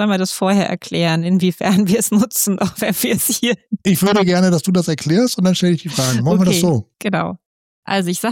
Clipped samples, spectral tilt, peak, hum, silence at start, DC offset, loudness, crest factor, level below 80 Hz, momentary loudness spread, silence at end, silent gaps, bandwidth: under 0.1%; -5 dB/octave; -6 dBFS; none; 0 s; under 0.1%; -16 LUFS; 10 dB; -54 dBFS; 6 LU; 0 s; 7.46-7.83 s; 17 kHz